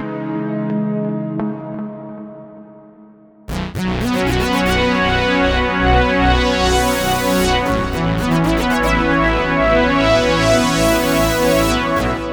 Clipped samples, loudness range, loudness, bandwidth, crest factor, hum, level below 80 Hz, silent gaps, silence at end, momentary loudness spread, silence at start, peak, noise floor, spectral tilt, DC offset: under 0.1%; 10 LU; -16 LUFS; over 20 kHz; 16 dB; none; -26 dBFS; none; 0 s; 11 LU; 0 s; 0 dBFS; -44 dBFS; -5 dB/octave; under 0.1%